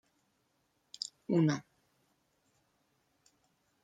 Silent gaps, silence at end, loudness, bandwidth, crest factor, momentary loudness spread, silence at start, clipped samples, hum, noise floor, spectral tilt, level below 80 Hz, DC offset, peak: none; 2.2 s; -34 LUFS; 9.4 kHz; 22 dB; 14 LU; 1.3 s; under 0.1%; none; -77 dBFS; -6 dB/octave; -82 dBFS; under 0.1%; -18 dBFS